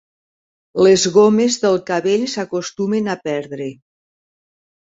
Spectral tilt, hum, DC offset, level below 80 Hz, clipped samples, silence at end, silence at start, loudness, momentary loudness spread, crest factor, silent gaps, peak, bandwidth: -4.5 dB/octave; none; under 0.1%; -60 dBFS; under 0.1%; 1.1 s; 0.75 s; -16 LUFS; 15 LU; 16 dB; none; -2 dBFS; 8 kHz